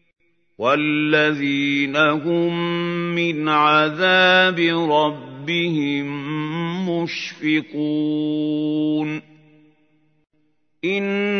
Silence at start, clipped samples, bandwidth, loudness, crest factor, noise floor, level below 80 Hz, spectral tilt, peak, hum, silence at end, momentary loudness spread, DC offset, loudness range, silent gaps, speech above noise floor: 0.6 s; under 0.1%; 6.6 kHz; -19 LUFS; 18 dB; -67 dBFS; -74 dBFS; -6 dB/octave; -2 dBFS; none; 0 s; 10 LU; under 0.1%; 7 LU; none; 48 dB